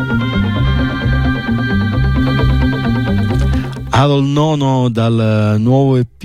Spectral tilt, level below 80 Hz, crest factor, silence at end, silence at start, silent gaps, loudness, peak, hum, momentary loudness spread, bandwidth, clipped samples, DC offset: -7.5 dB/octave; -22 dBFS; 12 dB; 0 s; 0 s; none; -14 LUFS; -2 dBFS; none; 4 LU; 10 kHz; under 0.1%; under 0.1%